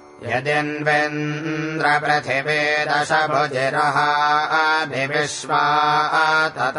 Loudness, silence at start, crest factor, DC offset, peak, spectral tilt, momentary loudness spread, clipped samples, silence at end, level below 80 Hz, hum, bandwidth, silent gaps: -19 LUFS; 0.1 s; 16 dB; under 0.1%; -4 dBFS; -4 dB/octave; 6 LU; under 0.1%; 0 s; -64 dBFS; none; 11 kHz; none